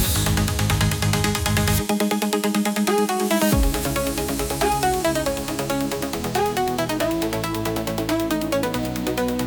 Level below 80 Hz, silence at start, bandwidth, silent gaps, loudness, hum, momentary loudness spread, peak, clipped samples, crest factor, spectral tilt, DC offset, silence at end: -32 dBFS; 0 s; 19.5 kHz; none; -22 LUFS; none; 5 LU; -6 dBFS; under 0.1%; 16 dB; -4.5 dB/octave; under 0.1%; 0 s